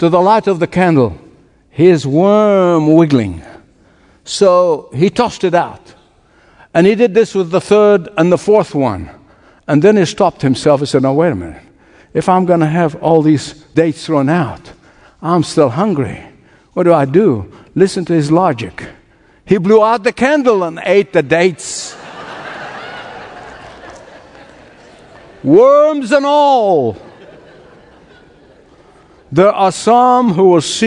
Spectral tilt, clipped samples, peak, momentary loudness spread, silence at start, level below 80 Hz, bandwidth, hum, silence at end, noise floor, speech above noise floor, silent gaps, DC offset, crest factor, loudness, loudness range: -6 dB/octave; 0.2%; 0 dBFS; 17 LU; 0 s; -50 dBFS; 10.5 kHz; none; 0 s; -49 dBFS; 38 dB; none; under 0.1%; 12 dB; -12 LUFS; 5 LU